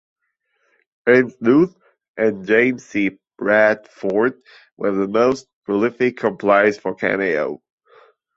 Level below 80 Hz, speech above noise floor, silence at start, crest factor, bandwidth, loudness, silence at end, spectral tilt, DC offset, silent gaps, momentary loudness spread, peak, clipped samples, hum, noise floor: -62 dBFS; 52 dB; 1.05 s; 18 dB; 7.8 kHz; -18 LUFS; 0.8 s; -6.5 dB/octave; under 0.1%; 2.08-2.14 s, 4.72-4.77 s, 5.53-5.62 s; 9 LU; -2 dBFS; under 0.1%; none; -69 dBFS